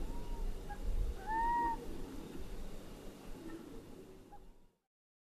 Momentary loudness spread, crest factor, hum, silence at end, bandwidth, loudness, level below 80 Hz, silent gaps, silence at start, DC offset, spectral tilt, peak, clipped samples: 20 LU; 16 dB; none; 0.6 s; 14 kHz; -43 LUFS; -44 dBFS; none; 0 s; under 0.1%; -5.5 dB/octave; -26 dBFS; under 0.1%